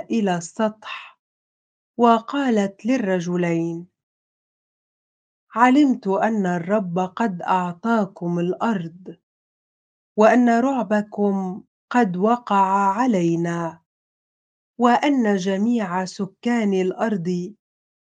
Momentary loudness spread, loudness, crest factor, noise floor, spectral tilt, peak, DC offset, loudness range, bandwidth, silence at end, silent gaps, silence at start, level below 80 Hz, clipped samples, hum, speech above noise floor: 12 LU; -21 LUFS; 22 dB; under -90 dBFS; -6.5 dB/octave; 0 dBFS; under 0.1%; 3 LU; 9.2 kHz; 0.65 s; 1.19-1.94 s, 4.03-5.47 s, 9.23-10.15 s, 11.68-11.88 s, 13.86-14.74 s; 0 s; -72 dBFS; under 0.1%; none; over 70 dB